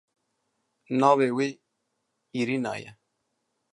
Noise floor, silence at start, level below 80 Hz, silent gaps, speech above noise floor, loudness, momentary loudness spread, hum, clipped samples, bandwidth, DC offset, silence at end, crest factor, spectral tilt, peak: -78 dBFS; 0.9 s; -76 dBFS; none; 54 dB; -25 LUFS; 14 LU; none; under 0.1%; 11 kHz; under 0.1%; 0.8 s; 22 dB; -6 dB/octave; -6 dBFS